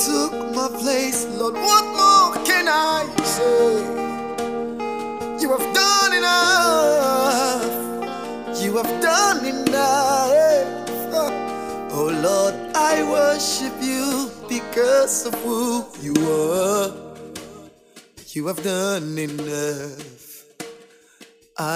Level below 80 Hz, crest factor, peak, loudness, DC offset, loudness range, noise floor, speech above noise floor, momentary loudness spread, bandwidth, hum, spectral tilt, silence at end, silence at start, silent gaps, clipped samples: -62 dBFS; 18 dB; -2 dBFS; -19 LUFS; 0.2%; 10 LU; -50 dBFS; 30 dB; 13 LU; 16 kHz; none; -2.5 dB/octave; 0 s; 0 s; none; under 0.1%